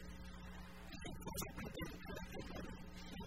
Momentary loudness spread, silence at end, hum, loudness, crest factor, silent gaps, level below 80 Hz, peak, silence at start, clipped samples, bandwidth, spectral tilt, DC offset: 8 LU; 0 s; none; -50 LUFS; 18 dB; none; -56 dBFS; -30 dBFS; 0 s; under 0.1%; 16 kHz; -4.5 dB/octave; 0.1%